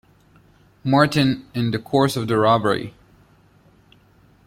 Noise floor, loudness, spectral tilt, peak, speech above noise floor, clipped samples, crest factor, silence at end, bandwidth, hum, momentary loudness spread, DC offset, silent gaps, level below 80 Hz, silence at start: -54 dBFS; -20 LUFS; -6 dB/octave; -2 dBFS; 35 dB; under 0.1%; 20 dB; 1.55 s; 16 kHz; none; 9 LU; under 0.1%; none; -54 dBFS; 0.85 s